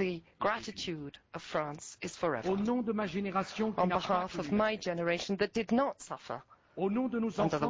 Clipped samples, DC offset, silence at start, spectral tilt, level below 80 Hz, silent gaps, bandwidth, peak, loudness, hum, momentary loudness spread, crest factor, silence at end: under 0.1%; under 0.1%; 0 s; -5.5 dB/octave; -62 dBFS; none; 8 kHz; -18 dBFS; -34 LUFS; none; 11 LU; 16 dB; 0 s